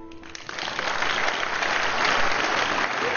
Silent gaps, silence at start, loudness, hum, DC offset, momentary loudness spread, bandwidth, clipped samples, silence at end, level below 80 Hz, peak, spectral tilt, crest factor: none; 0 s; -23 LUFS; none; under 0.1%; 11 LU; 7.2 kHz; under 0.1%; 0 s; -48 dBFS; -8 dBFS; -1.5 dB/octave; 18 dB